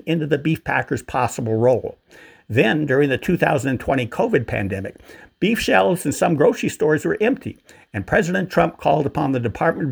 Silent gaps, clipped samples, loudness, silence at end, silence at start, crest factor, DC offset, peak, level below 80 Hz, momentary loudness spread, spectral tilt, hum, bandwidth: none; under 0.1%; -20 LUFS; 0 s; 0.05 s; 20 dB; under 0.1%; 0 dBFS; -48 dBFS; 7 LU; -6 dB/octave; none; over 20 kHz